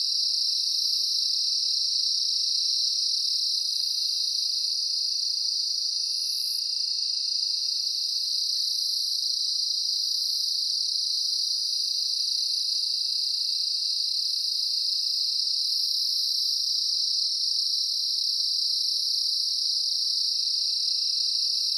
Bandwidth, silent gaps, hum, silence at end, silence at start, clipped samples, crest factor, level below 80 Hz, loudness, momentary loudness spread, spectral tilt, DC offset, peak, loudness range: 17.5 kHz; none; none; 0 s; 0 s; under 0.1%; 14 dB; under -90 dBFS; -23 LUFS; 2 LU; 13 dB/octave; under 0.1%; -12 dBFS; 2 LU